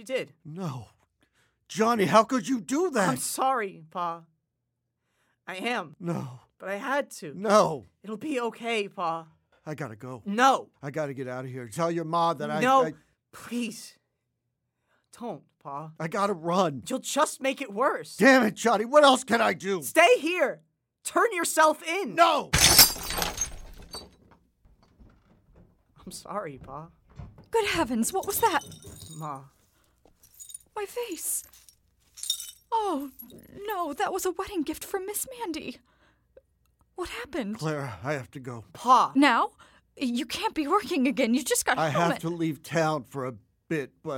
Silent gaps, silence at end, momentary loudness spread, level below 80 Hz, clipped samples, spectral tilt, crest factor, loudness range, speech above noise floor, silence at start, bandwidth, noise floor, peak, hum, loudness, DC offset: none; 0 s; 20 LU; -54 dBFS; under 0.1%; -3 dB/octave; 26 dB; 13 LU; 54 dB; 0 s; 17 kHz; -81 dBFS; -2 dBFS; none; -26 LUFS; under 0.1%